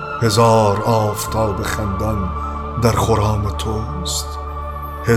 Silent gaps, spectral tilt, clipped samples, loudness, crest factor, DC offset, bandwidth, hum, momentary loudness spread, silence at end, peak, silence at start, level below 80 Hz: none; -5.5 dB/octave; under 0.1%; -18 LUFS; 16 dB; under 0.1%; 16 kHz; none; 12 LU; 0 s; -2 dBFS; 0 s; -28 dBFS